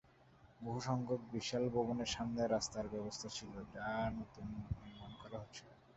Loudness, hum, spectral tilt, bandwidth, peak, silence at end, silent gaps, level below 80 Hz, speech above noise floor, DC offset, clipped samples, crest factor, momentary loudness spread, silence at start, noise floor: -42 LUFS; none; -5 dB/octave; 8 kHz; -24 dBFS; 0.05 s; none; -60 dBFS; 25 dB; under 0.1%; under 0.1%; 18 dB; 13 LU; 0.2 s; -66 dBFS